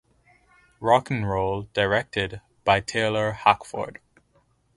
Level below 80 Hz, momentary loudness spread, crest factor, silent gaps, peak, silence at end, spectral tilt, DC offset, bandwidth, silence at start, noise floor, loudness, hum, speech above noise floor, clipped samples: -50 dBFS; 10 LU; 22 dB; none; -2 dBFS; 0.85 s; -5 dB/octave; under 0.1%; 11.5 kHz; 0.8 s; -64 dBFS; -24 LUFS; none; 41 dB; under 0.1%